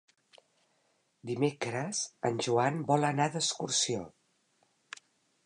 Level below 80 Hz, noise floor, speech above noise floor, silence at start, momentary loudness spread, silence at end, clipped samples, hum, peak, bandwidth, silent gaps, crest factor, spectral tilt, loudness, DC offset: -74 dBFS; -74 dBFS; 43 dB; 1.25 s; 20 LU; 1.35 s; under 0.1%; none; -14 dBFS; 11.5 kHz; none; 20 dB; -3.5 dB/octave; -31 LUFS; under 0.1%